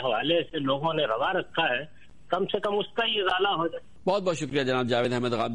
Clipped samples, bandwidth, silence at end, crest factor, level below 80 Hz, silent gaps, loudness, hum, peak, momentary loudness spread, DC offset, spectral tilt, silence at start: under 0.1%; 11 kHz; 0 s; 16 dB; -60 dBFS; none; -27 LUFS; none; -12 dBFS; 5 LU; 0.5%; -5 dB/octave; 0 s